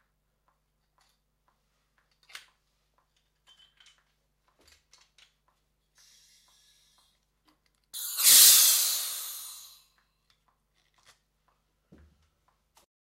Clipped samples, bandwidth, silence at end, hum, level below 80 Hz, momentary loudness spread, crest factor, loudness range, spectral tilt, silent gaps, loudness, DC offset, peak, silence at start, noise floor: under 0.1%; 16 kHz; 3.45 s; 50 Hz at -80 dBFS; -74 dBFS; 27 LU; 28 dB; 20 LU; 4 dB/octave; none; -18 LUFS; under 0.1%; -4 dBFS; 7.95 s; -74 dBFS